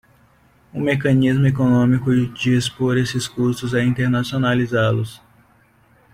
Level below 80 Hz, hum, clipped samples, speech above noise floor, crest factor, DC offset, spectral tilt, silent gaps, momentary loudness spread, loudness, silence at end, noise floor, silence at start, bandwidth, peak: -48 dBFS; none; under 0.1%; 37 dB; 14 dB; under 0.1%; -6.5 dB/octave; none; 6 LU; -19 LUFS; 0.95 s; -55 dBFS; 0.75 s; 15 kHz; -4 dBFS